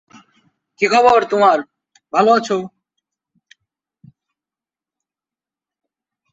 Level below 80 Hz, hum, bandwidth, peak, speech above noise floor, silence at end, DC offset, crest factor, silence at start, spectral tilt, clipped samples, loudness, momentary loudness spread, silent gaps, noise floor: -62 dBFS; none; 8 kHz; -2 dBFS; 76 dB; 3.65 s; under 0.1%; 18 dB; 0.8 s; -4.5 dB/octave; under 0.1%; -15 LUFS; 11 LU; none; -90 dBFS